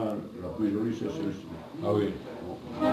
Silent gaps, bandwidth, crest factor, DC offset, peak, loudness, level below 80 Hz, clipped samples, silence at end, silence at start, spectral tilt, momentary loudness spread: none; 13.5 kHz; 16 dB; under 0.1%; -14 dBFS; -32 LUFS; -58 dBFS; under 0.1%; 0 s; 0 s; -7.5 dB/octave; 11 LU